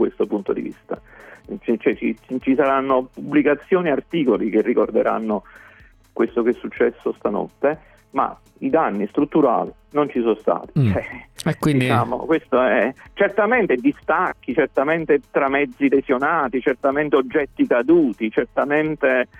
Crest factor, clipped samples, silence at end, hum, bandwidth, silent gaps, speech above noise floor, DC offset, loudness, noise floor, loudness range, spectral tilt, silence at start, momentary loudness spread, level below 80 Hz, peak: 16 dB; under 0.1%; 0.15 s; none; 13 kHz; none; 25 dB; under 0.1%; -20 LUFS; -44 dBFS; 3 LU; -7.5 dB/octave; 0 s; 8 LU; -52 dBFS; -4 dBFS